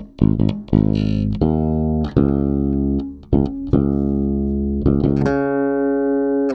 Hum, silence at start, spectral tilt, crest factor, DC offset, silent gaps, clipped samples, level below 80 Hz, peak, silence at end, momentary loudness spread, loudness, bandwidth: none; 0 s; -10.5 dB/octave; 18 dB; under 0.1%; none; under 0.1%; -28 dBFS; 0 dBFS; 0 s; 3 LU; -19 LUFS; 6.2 kHz